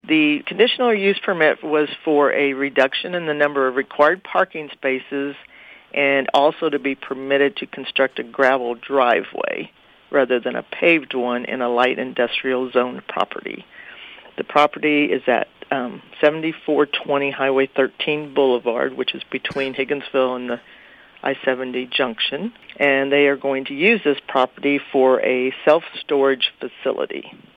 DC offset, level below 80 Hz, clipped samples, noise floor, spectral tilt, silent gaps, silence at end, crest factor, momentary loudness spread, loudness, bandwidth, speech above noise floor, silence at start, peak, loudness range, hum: under 0.1%; -68 dBFS; under 0.1%; -43 dBFS; -6 dB/octave; none; 0.25 s; 18 dB; 10 LU; -19 LUFS; 8 kHz; 23 dB; 0.05 s; -2 dBFS; 4 LU; none